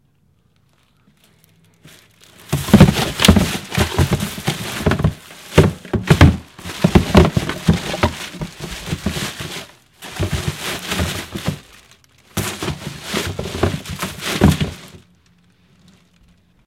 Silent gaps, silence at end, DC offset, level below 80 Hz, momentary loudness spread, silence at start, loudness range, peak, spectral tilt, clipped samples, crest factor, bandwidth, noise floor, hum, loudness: none; 1.7 s; under 0.1%; -30 dBFS; 16 LU; 1.85 s; 9 LU; 0 dBFS; -5.5 dB/octave; under 0.1%; 18 dB; 17 kHz; -59 dBFS; none; -18 LUFS